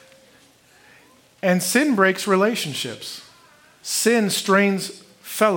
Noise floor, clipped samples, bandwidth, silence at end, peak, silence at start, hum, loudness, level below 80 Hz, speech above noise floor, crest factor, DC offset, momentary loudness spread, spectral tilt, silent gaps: -54 dBFS; under 0.1%; 17 kHz; 0 s; -2 dBFS; 1.45 s; none; -20 LUFS; -74 dBFS; 34 dB; 20 dB; under 0.1%; 16 LU; -3.5 dB/octave; none